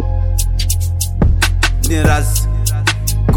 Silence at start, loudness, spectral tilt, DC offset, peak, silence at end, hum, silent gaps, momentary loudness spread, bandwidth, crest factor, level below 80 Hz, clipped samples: 0 s; -15 LUFS; -4 dB/octave; under 0.1%; 0 dBFS; 0 s; none; none; 4 LU; 17 kHz; 12 dB; -16 dBFS; under 0.1%